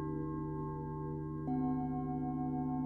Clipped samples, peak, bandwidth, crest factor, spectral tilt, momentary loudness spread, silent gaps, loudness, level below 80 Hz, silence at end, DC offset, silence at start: under 0.1%; -26 dBFS; 2.3 kHz; 12 dB; -12.5 dB/octave; 5 LU; none; -38 LUFS; -54 dBFS; 0 s; under 0.1%; 0 s